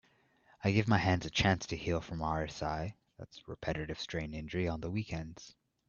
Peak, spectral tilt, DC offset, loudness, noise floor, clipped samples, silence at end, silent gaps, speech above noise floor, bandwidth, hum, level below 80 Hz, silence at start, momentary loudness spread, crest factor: -14 dBFS; -5.5 dB/octave; under 0.1%; -35 LUFS; -69 dBFS; under 0.1%; 0.4 s; none; 34 dB; 7.2 kHz; none; -54 dBFS; 0.6 s; 18 LU; 22 dB